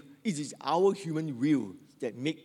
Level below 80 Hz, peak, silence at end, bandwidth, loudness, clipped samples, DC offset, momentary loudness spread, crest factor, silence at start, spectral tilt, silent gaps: -86 dBFS; -14 dBFS; 0.05 s; 12 kHz; -31 LUFS; under 0.1%; under 0.1%; 12 LU; 16 dB; 0.05 s; -6 dB/octave; none